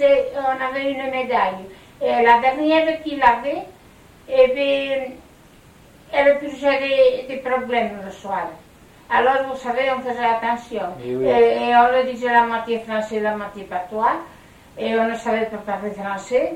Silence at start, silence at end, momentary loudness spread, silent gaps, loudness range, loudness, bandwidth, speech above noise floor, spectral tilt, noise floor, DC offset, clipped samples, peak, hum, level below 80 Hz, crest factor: 0 s; 0 s; 12 LU; none; 4 LU; -20 LUFS; 13 kHz; 28 dB; -5 dB/octave; -48 dBFS; under 0.1%; under 0.1%; -2 dBFS; none; -54 dBFS; 18 dB